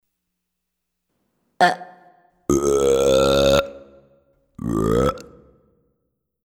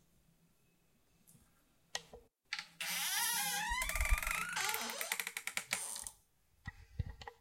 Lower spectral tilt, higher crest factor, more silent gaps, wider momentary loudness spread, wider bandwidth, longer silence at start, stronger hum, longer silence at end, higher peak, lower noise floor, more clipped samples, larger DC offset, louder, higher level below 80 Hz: first, -4.5 dB/octave vs -1 dB/octave; about the same, 22 dB vs 24 dB; neither; first, 16 LU vs 13 LU; about the same, 18 kHz vs 16.5 kHz; first, 1.6 s vs 1.3 s; neither; first, 1.25 s vs 0.05 s; first, -2 dBFS vs -18 dBFS; first, -79 dBFS vs -74 dBFS; neither; neither; first, -19 LUFS vs -38 LUFS; first, -40 dBFS vs -48 dBFS